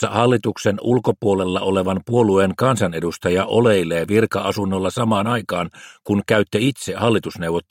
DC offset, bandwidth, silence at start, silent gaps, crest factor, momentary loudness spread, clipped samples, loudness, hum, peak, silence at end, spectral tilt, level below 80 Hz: under 0.1%; 16.5 kHz; 0 s; none; 18 dB; 6 LU; under 0.1%; -19 LUFS; none; -2 dBFS; 0.1 s; -6 dB/octave; -54 dBFS